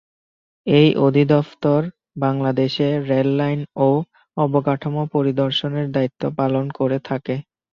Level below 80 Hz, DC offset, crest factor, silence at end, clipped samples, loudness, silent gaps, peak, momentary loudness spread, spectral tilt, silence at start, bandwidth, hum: -58 dBFS; under 0.1%; 18 dB; 0.3 s; under 0.1%; -19 LUFS; none; -2 dBFS; 9 LU; -8.5 dB/octave; 0.65 s; 6.8 kHz; none